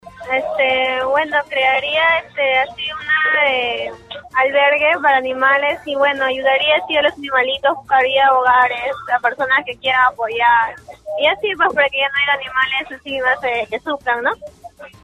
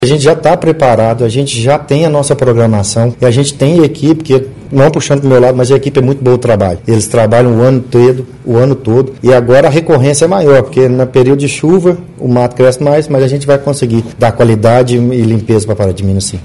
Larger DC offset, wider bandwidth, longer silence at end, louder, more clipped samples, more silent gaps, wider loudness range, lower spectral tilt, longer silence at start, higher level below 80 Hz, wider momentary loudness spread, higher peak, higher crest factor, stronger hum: second, under 0.1% vs 1%; about the same, 11.5 kHz vs 12 kHz; first, 0.15 s vs 0 s; second, -16 LUFS vs -9 LUFS; second, under 0.1% vs 2%; neither; about the same, 2 LU vs 2 LU; second, -3.5 dB/octave vs -6.5 dB/octave; about the same, 0.05 s vs 0 s; second, -54 dBFS vs -38 dBFS; first, 9 LU vs 5 LU; about the same, -2 dBFS vs 0 dBFS; first, 16 dB vs 8 dB; neither